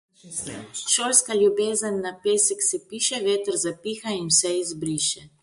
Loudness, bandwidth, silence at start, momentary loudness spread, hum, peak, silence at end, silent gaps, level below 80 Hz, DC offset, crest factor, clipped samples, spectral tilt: -22 LUFS; 12 kHz; 0.25 s; 13 LU; none; -2 dBFS; 0.15 s; none; -64 dBFS; under 0.1%; 22 dB; under 0.1%; -2 dB/octave